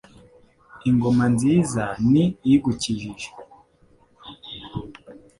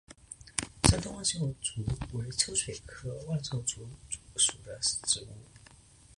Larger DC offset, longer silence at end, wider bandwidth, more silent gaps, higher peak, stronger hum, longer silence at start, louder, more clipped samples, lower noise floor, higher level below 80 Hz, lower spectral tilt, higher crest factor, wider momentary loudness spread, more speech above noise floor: neither; second, 0.25 s vs 0.45 s; about the same, 11.5 kHz vs 12 kHz; neither; second, -6 dBFS vs 0 dBFS; neither; first, 0.75 s vs 0.1 s; first, -21 LUFS vs -31 LUFS; neither; about the same, -57 dBFS vs -57 dBFS; about the same, -50 dBFS vs -46 dBFS; first, -6.5 dB/octave vs -3 dB/octave; second, 16 dB vs 34 dB; first, 18 LU vs 15 LU; first, 37 dB vs 23 dB